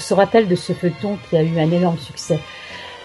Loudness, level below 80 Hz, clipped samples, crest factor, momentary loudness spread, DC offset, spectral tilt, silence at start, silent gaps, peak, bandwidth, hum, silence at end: -19 LUFS; -52 dBFS; under 0.1%; 18 dB; 14 LU; under 0.1%; -6.5 dB/octave; 0 s; none; 0 dBFS; 12 kHz; none; 0 s